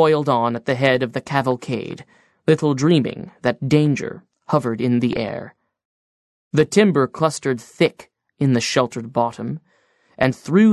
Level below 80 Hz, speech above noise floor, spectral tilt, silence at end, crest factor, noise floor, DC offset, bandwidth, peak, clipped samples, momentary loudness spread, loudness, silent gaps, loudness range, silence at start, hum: -58 dBFS; 42 dB; -6 dB/octave; 0 s; 18 dB; -60 dBFS; under 0.1%; 12.5 kHz; -2 dBFS; under 0.1%; 11 LU; -20 LUFS; 5.85-6.51 s; 2 LU; 0 s; none